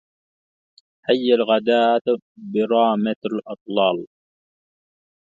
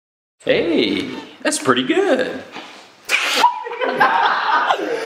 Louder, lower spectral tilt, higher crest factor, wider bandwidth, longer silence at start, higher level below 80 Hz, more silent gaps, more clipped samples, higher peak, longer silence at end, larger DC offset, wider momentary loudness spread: second, -20 LUFS vs -17 LUFS; first, -7 dB/octave vs -2.5 dB/octave; about the same, 20 dB vs 18 dB; second, 7.4 kHz vs 16 kHz; first, 1.1 s vs 0.45 s; second, -72 dBFS vs -60 dBFS; first, 2.01-2.05 s, 2.22-2.35 s, 3.16-3.22 s, 3.61-3.66 s vs none; neither; about the same, -2 dBFS vs 0 dBFS; first, 1.35 s vs 0 s; neither; second, 10 LU vs 15 LU